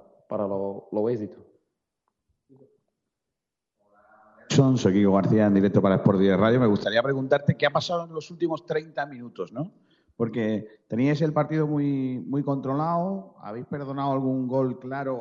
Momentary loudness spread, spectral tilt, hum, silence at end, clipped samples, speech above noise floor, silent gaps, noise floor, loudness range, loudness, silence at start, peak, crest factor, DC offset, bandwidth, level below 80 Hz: 14 LU; -6.5 dB/octave; none; 0 s; under 0.1%; 62 dB; none; -86 dBFS; 12 LU; -25 LUFS; 0.3 s; -6 dBFS; 18 dB; under 0.1%; 7.8 kHz; -66 dBFS